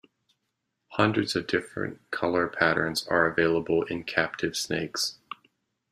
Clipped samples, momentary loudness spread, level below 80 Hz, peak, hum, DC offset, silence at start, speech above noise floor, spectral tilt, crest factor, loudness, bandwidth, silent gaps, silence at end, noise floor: under 0.1%; 11 LU; -62 dBFS; -6 dBFS; none; under 0.1%; 0.9 s; 53 dB; -4 dB/octave; 22 dB; -27 LUFS; 15.5 kHz; none; 0.55 s; -80 dBFS